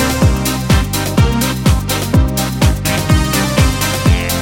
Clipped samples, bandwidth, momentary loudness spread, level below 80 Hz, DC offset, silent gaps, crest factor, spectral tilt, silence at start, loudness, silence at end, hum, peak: under 0.1%; 19.5 kHz; 3 LU; -20 dBFS; under 0.1%; none; 12 dB; -5 dB/octave; 0 s; -14 LUFS; 0 s; none; 0 dBFS